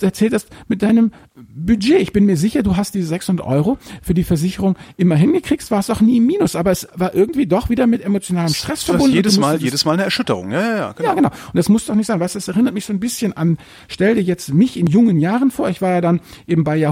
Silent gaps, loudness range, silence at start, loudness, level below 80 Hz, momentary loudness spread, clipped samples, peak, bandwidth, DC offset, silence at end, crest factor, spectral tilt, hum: none; 2 LU; 0 s; -17 LUFS; -40 dBFS; 7 LU; under 0.1%; 0 dBFS; 16.5 kHz; under 0.1%; 0 s; 16 dB; -6 dB/octave; none